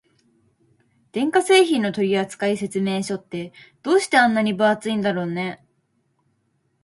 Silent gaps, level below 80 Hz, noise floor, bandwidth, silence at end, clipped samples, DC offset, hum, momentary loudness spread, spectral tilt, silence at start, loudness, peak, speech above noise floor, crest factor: none; -68 dBFS; -68 dBFS; 11.5 kHz; 1.3 s; under 0.1%; under 0.1%; none; 16 LU; -4.5 dB/octave; 1.15 s; -20 LUFS; -4 dBFS; 48 dB; 18 dB